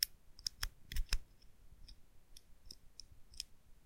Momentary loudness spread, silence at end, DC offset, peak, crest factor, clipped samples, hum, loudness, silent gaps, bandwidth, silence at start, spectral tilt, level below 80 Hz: 21 LU; 0 s; under 0.1%; -12 dBFS; 32 dB; under 0.1%; none; -45 LUFS; none; 16.5 kHz; 0 s; -0.5 dB/octave; -48 dBFS